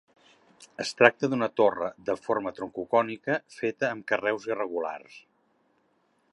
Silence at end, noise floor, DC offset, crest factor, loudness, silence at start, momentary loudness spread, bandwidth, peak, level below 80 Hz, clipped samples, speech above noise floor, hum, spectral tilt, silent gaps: 1.15 s; -70 dBFS; under 0.1%; 28 dB; -27 LUFS; 0.6 s; 14 LU; 11.5 kHz; -2 dBFS; -72 dBFS; under 0.1%; 42 dB; none; -5 dB/octave; none